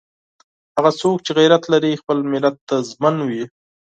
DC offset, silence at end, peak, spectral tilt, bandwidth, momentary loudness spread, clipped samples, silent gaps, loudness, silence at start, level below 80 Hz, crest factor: under 0.1%; 0.4 s; 0 dBFS; -5.5 dB/octave; 9 kHz; 11 LU; under 0.1%; 2.61-2.67 s; -18 LUFS; 0.75 s; -66 dBFS; 18 dB